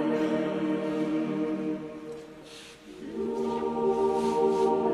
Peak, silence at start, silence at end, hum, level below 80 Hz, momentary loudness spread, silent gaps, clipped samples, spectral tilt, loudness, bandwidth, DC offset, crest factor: -14 dBFS; 0 s; 0 s; none; -62 dBFS; 19 LU; none; under 0.1%; -6.5 dB/octave; -28 LUFS; 12 kHz; under 0.1%; 14 dB